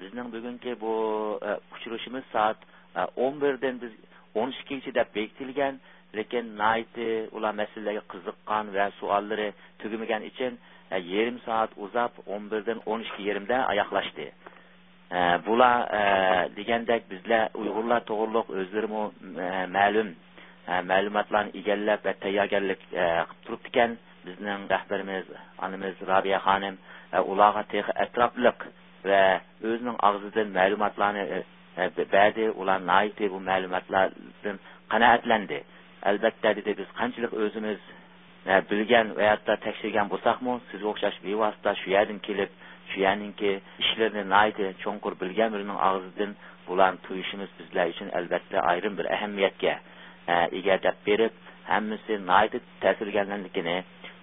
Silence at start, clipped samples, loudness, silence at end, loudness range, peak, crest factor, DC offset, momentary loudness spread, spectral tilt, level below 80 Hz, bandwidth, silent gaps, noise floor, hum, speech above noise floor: 0 s; under 0.1%; -27 LUFS; 0.05 s; 5 LU; -4 dBFS; 24 dB; under 0.1%; 13 LU; -9 dB/octave; -62 dBFS; 4 kHz; none; -56 dBFS; none; 29 dB